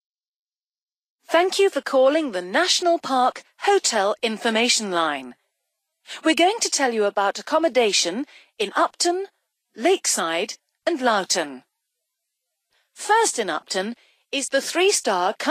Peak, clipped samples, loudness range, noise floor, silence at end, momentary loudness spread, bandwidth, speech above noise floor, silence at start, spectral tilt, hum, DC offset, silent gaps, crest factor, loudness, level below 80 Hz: -6 dBFS; under 0.1%; 4 LU; under -90 dBFS; 0 s; 10 LU; 15.5 kHz; over 69 dB; 1.3 s; -1.5 dB/octave; none; under 0.1%; none; 18 dB; -21 LUFS; -78 dBFS